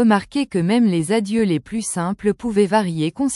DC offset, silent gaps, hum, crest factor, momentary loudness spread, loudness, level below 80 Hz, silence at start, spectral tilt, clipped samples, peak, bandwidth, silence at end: under 0.1%; none; none; 14 dB; 6 LU; -19 LUFS; -52 dBFS; 0 s; -5.5 dB/octave; under 0.1%; -4 dBFS; 12 kHz; 0 s